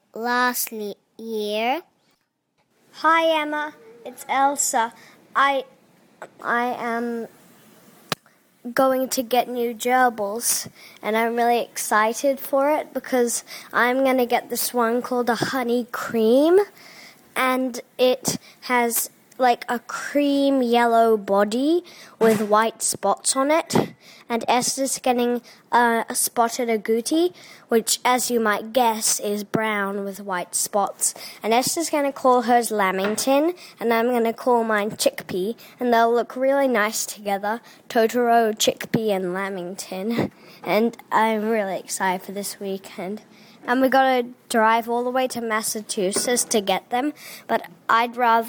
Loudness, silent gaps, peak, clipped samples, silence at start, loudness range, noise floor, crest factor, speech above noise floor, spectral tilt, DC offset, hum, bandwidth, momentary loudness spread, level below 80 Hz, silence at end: -22 LUFS; none; -6 dBFS; under 0.1%; 0.15 s; 4 LU; -70 dBFS; 16 dB; 48 dB; -3 dB/octave; under 0.1%; none; 19.5 kHz; 11 LU; -68 dBFS; 0 s